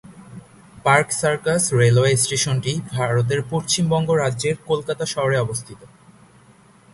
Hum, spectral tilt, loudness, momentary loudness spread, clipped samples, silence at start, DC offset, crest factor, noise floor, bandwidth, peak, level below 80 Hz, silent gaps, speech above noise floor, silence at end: none; -4.5 dB/octave; -20 LUFS; 8 LU; under 0.1%; 0.1 s; under 0.1%; 20 dB; -51 dBFS; 11.5 kHz; 0 dBFS; -52 dBFS; none; 31 dB; 1.05 s